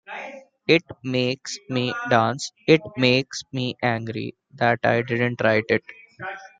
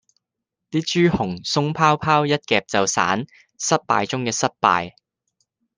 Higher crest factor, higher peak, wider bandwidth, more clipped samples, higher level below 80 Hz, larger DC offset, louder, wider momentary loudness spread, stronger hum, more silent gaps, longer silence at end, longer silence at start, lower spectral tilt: about the same, 20 dB vs 20 dB; about the same, -2 dBFS vs -2 dBFS; about the same, 9.4 kHz vs 10 kHz; neither; second, -62 dBFS vs -54 dBFS; neither; about the same, -22 LUFS vs -20 LUFS; first, 15 LU vs 7 LU; neither; neither; second, 0.15 s vs 0.85 s; second, 0.1 s vs 0.75 s; about the same, -5 dB/octave vs -4 dB/octave